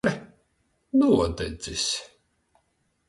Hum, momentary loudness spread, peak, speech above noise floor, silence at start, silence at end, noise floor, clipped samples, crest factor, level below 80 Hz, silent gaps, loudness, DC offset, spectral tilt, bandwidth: none; 12 LU; -8 dBFS; 48 dB; 0.05 s; 1.05 s; -71 dBFS; under 0.1%; 18 dB; -46 dBFS; none; -25 LUFS; under 0.1%; -4.5 dB/octave; 11.5 kHz